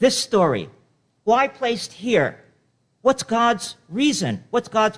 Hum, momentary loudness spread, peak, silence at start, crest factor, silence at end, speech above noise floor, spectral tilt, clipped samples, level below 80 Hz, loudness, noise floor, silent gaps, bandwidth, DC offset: none; 8 LU; -4 dBFS; 0 s; 16 dB; 0 s; 45 dB; -4 dB/octave; under 0.1%; -60 dBFS; -21 LUFS; -65 dBFS; none; 11 kHz; under 0.1%